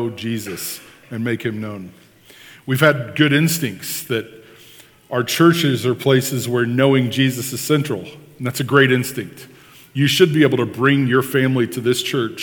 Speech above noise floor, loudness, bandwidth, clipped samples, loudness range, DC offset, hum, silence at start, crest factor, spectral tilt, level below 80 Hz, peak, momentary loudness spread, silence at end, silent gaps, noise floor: 28 dB; -18 LUFS; 19.5 kHz; under 0.1%; 3 LU; under 0.1%; none; 0 s; 18 dB; -5 dB/octave; -64 dBFS; 0 dBFS; 14 LU; 0 s; none; -46 dBFS